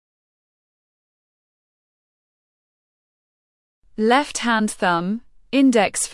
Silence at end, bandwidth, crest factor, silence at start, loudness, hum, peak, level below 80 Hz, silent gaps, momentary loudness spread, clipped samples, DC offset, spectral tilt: 0 s; 12 kHz; 18 dB; 4 s; -19 LUFS; none; -4 dBFS; -60 dBFS; none; 11 LU; under 0.1%; under 0.1%; -3.5 dB/octave